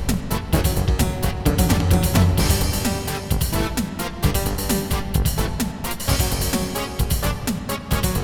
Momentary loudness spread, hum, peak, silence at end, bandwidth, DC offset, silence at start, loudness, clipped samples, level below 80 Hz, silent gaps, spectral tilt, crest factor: 7 LU; none; -4 dBFS; 0 s; 19 kHz; under 0.1%; 0 s; -22 LUFS; under 0.1%; -26 dBFS; none; -5 dB/octave; 16 dB